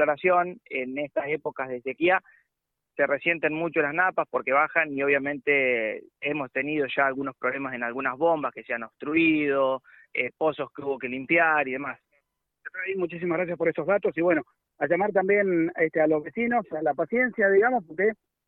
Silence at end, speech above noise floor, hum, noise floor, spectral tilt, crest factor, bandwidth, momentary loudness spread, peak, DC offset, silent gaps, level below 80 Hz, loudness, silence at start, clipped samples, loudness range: 0.35 s; 58 dB; none; -83 dBFS; -9 dB/octave; 18 dB; 4.2 kHz; 10 LU; -8 dBFS; under 0.1%; none; -70 dBFS; -25 LUFS; 0 s; under 0.1%; 3 LU